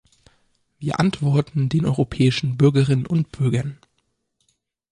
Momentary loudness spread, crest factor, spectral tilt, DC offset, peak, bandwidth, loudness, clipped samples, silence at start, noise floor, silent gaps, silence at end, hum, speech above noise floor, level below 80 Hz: 8 LU; 16 dB; -7.5 dB/octave; under 0.1%; -4 dBFS; 10.5 kHz; -20 LUFS; under 0.1%; 0.8 s; -71 dBFS; none; 1.2 s; none; 52 dB; -50 dBFS